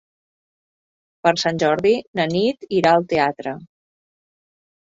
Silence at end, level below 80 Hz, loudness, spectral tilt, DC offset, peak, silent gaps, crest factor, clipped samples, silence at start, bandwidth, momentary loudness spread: 1.2 s; -60 dBFS; -19 LUFS; -5 dB/octave; under 0.1%; -2 dBFS; 2.07-2.13 s; 18 dB; under 0.1%; 1.25 s; 7.8 kHz; 9 LU